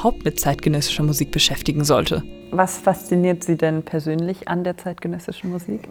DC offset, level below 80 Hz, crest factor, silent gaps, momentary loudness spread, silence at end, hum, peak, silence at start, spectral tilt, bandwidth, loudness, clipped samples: under 0.1%; -40 dBFS; 20 dB; none; 11 LU; 0 s; none; -2 dBFS; 0 s; -4.5 dB/octave; 19 kHz; -21 LUFS; under 0.1%